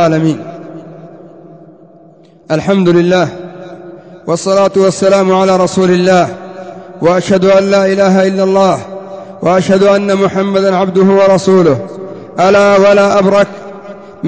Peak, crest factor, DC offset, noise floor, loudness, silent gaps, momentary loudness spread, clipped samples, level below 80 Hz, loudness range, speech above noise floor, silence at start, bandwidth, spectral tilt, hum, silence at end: 0 dBFS; 10 dB; 0.4%; -41 dBFS; -10 LUFS; none; 20 LU; under 0.1%; -48 dBFS; 6 LU; 32 dB; 0 s; 8 kHz; -6 dB/octave; none; 0 s